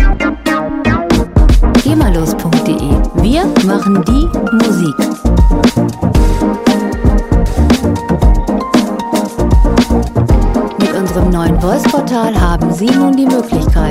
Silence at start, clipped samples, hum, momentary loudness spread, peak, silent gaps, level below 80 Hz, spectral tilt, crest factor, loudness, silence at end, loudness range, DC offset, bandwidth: 0 s; under 0.1%; none; 4 LU; 0 dBFS; none; -14 dBFS; -6.5 dB/octave; 10 dB; -12 LUFS; 0 s; 1 LU; under 0.1%; 15.5 kHz